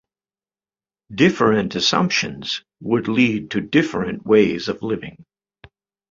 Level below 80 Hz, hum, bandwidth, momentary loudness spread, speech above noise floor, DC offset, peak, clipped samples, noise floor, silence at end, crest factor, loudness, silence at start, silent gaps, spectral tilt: -54 dBFS; none; 7.6 kHz; 11 LU; over 71 dB; under 0.1%; -2 dBFS; under 0.1%; under -90 dBFS; 0.9 s; 18 dB; -19 LUFS; 1.1 s; none; -5 dB/octave